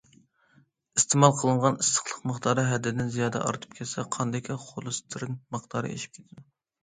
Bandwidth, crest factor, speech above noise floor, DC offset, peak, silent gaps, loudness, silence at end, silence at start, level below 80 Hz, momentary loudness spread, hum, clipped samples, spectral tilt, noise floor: 9.6 kHz; 26 dB; 36 dB; under 0.1%; -4 dBFS; none; -27 LUFS; 0.4 s; 0.95 s; -64 dBFS; 15 LU; none; under 0.1%; -4.5 dB/octave; -64 dBFS